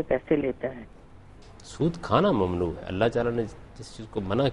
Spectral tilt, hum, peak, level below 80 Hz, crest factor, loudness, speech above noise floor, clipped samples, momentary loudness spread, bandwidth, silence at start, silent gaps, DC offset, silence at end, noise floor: -7 dB/octave; none; -8 dBFS; -48 dBFS; 20 dB; -27 LUFS; 22 dB; under 0.1%; 20 LU; 11 kHz; 0 s; none; under 0.1%; 0 s; -48 dBFS